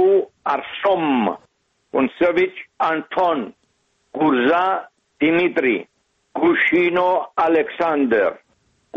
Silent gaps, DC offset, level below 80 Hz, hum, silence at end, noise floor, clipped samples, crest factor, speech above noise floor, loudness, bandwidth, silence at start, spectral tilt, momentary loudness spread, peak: none; under 0.1%; -60 dBFS; none; 0 s; -66 dBFS; under 0.1%; 14 dB; 47 dB; -19 LUFS; 6.4 kHz; 0 s; -7 dB/octave; 9 LU; -6 dBFS